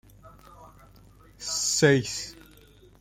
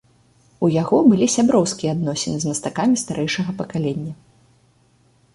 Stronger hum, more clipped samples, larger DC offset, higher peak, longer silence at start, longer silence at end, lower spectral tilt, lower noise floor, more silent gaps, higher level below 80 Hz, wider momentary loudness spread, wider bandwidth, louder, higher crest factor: first, 50 Hz at -50 dBFS vs none; neither; neither; second, -8 dBFS vs -2 dBFS; second, 0.25 s vs 0.6 s; second, 0.65 s vs 1.2 s; second, -3.5 dB/octave vs -5 dB/octave; second, -54 dBFS vs -58 dBFS; neither; about the same, -56 dBFS vs -56 dBFS; first, 17 LU vs 10 LU; first, 16.5 kHz vs 11.5 kHz; second, -24 LUFS vs -19 LUFS; about the same, 22 dB vs 18 dB